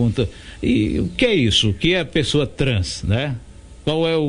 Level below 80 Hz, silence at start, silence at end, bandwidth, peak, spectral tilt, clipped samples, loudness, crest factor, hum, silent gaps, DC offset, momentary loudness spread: -36 dBFS; 0 s; 0 s; 10.5 kHz; -4 dBFS; -5.5 dB/octave; under 0.1%; -19 LUFS; 16 dB; none; none; under 0.1%; 10 LU